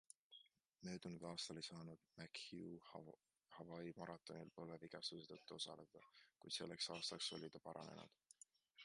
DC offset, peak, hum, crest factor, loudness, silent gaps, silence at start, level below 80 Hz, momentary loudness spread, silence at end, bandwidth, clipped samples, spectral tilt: under 0.1%; -34 dBFS; none; 22 dB; -53 LUFS; none; 0.3 s; -86 dBFS; 19 LU; 0 s; 11 kHz; under 0.1%; -3.5 dB/octave